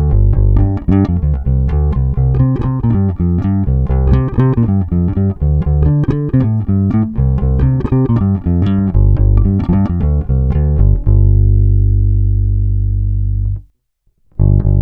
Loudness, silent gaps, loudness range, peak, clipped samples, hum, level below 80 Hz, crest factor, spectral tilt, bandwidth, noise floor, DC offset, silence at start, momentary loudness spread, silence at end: -14 LUFS; none; 1 LU; 0 dBFS; under 0.1%; 50 Hz at -30 dBFS; -16 dBFS; 12 dB; -12 dB/octave; 3.5 kHz; -60 dBFS; under 0.1%; 0 s; 4 LU; 0 s